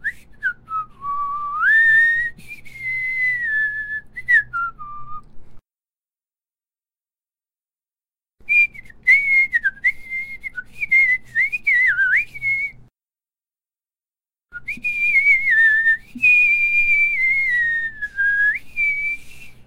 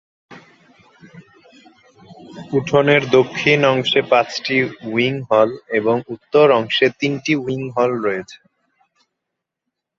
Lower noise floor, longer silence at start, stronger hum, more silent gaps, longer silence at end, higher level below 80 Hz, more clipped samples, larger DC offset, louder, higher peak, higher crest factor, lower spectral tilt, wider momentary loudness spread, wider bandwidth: first, under -90 dBFS vs -80 dBFS; second, 0 s vs 0.3 s; neither; neither; second, 0.05 s vs 1.65 s; first, -50 dBFS vs -60 dBFS; neither; neither; about the same, -16 LUFS vs -17 LUFS; about the same, -4 dBFS vs -2 dBFS; about the same, 16 dB vs 18 dB; second, -2 dB/octave vs -5.5 dB/octave; first, 15 LU vs 9 LU; first, 16 kHz vs 7.6 kHz